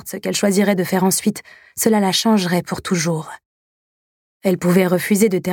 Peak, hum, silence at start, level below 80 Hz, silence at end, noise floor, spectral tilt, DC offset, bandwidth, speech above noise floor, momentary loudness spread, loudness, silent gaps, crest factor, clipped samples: -2 dBFS; none; 0.05 s; -58 dBFS; 0 s; under -90 dBFS; -4.5 dB/octave; under 0.1%; 18.5 kHz; over 73 dB; 8 LU; -18 LUFS; 3.45-4.41 s; 18 dB; under 0.1%